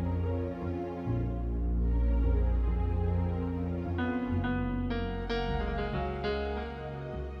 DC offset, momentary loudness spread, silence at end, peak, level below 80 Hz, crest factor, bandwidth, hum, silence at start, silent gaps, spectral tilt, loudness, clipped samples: under 0.1%; 6 LU; 0 s; -18 dBFS; -34 dBFS; 12 dB; 5.8 kHz; none; 0 s; none; -9 dB/octave; -33 LUFS; under 0.1%